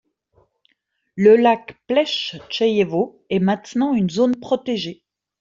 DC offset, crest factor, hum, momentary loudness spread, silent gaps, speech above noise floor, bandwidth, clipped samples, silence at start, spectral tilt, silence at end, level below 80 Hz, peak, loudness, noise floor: under 0.1%; 18 dB; none; 11 LU; none; 51 dB; 7.6 kHz; under 0.1%; 1.15 s; -6 dB/octave; 0.45 s; -62 dBFS; -2 dBFS; -19 LUFS; -69 dBFS